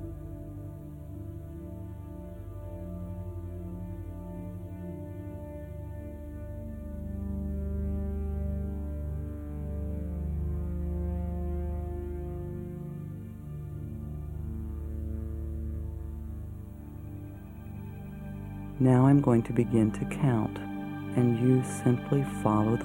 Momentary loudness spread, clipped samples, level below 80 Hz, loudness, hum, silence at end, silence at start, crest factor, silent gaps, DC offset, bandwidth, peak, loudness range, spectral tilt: 16 LU; under 0.1%; -40 dBFS; -32 LUFS; 50 Hz at -45 dBFS; 0 s; 0 s; 22 dB; none; under 0.1%; 16 kHz; -10 dBFS; 14 LU; -8.5 dB/octave